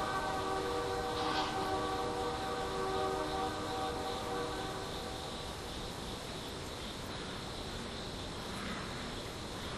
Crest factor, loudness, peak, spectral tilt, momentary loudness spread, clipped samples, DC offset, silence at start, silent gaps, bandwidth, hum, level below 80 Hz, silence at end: 16 dB; -38 LUFS; -22 dBFS; -4 dB/octave; 7 LU; under 0.1%; under 0.1%; 0 s; none; 15 kHz; none; -52 dBFS; 0 s